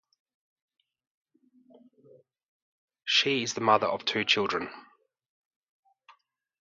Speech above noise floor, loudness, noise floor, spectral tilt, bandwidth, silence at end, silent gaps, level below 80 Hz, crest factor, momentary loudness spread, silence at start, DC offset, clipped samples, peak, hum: 38 dB; -26 LUFS; -65 dBFS; -2.5 dB/octave; 7.8 kHz; 1.8 s; none; -72 dBFS; 26 dB; 11 LU; 3.05 s; under 0.1%; under 0.1%; -8 dBFS; none